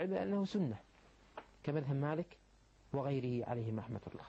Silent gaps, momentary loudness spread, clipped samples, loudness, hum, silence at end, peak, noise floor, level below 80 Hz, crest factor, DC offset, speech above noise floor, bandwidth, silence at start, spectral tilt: none; 14 LU; under 0.1%; -39 LUFS; none; 0 s; -24 dBFS; -58 dBFS; -68 dBFS; 16 dB; under 0.1%; 20 dB; 8 kHz; 0 s; -8.5 dB/octave